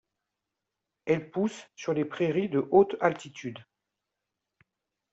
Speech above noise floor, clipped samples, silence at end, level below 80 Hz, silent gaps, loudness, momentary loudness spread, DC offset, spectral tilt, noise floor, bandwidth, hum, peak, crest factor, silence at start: 59 dB; under 0.1%; 1.5 s; -70 dBFS; none; -28 LUFS; 17 LU; under 0.1%; -6.5 dB/octave; -86 dBFS; 8 kHz; none; -8 dBFS; 22 dB; 1.05 s